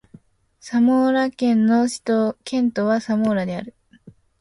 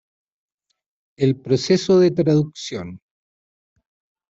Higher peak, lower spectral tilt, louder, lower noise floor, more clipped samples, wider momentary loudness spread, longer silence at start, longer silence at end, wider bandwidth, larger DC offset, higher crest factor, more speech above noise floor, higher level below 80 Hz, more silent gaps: about the same, -8 dBFS vs -6 dBFS; about the same, -6 dB/octave vs -6.5 dB/octave; about the same, -20 LUFS vs -18 LUFS; second, -50 dBFS vs under -90 dBFS; neither; second, 8 LU vs 15 LU; second, 0.65 s vs 1.2 s; second, 0.3 s vs 1.35 s; first, 11.5 kHz vs 8 kHz; neither; about the same, 12 dB vs 16 dB; second, 31 dB vs over 72 dB; about the same, -60 dBFS vs -60 dBFS; neither